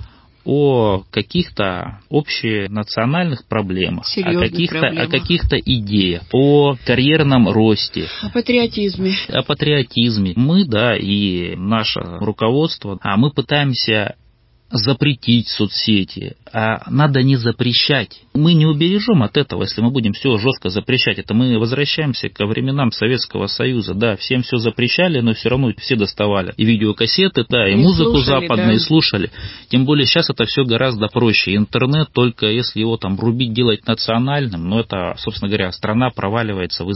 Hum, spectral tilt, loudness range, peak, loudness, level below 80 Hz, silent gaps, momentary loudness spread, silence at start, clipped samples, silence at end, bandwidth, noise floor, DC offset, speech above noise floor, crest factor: none; -9.5 dB/octave; 4 LU; -2 dBFS; -16 LUFS; -38 dBFS; none; 7 LU; 0 s; under 0.1%; 0 s; 5.8 kHz; -52 dBFS; under 0.1%; 36 dB; 16 dB